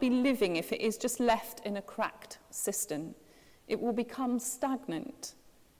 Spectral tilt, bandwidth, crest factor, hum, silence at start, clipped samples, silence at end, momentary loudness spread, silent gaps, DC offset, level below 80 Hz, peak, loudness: -3.5 dB/octave; 16 kHz; 20 dB; none; 0 s; under 0.1%; 0.3 s; 14 LU; none; under 0.1%; -66 dBFS; -12 dBFS; -33 LUFS